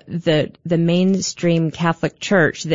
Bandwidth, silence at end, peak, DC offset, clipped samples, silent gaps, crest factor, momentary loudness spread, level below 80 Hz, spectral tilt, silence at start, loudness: 7.8 kHz; 0 s; -4 dBFS; 0.3%; under 0.1%; none; 14 dB; 4 LU; -54 dBFS; -5.5 dB/octave; 0.05 s; -18 LUFS